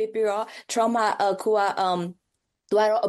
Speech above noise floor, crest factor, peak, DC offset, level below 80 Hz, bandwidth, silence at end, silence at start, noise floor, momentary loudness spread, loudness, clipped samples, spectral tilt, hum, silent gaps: 45 dB; 14 dB; -10 dBFS; under 0.1%; -76 dBFS; 12.5 kHz; 0 s; 0 s; -69 dBFS; 7 LU; -24 LUFS; under 0.1%; -4 dB/octave; none; none